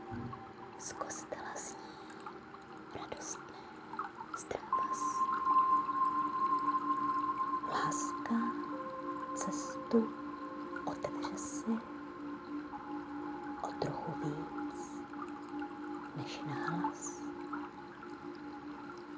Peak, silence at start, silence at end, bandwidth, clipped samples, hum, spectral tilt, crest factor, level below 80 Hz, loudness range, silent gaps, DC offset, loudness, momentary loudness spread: -18 dBFS; 0 s; 0 s; 8 kHz; under 0.1%; none; -4.5 dB/octave; 20 dB; -70 dBFS; 12 LU; none; under 0.1%; -38 LUFS; 14 LU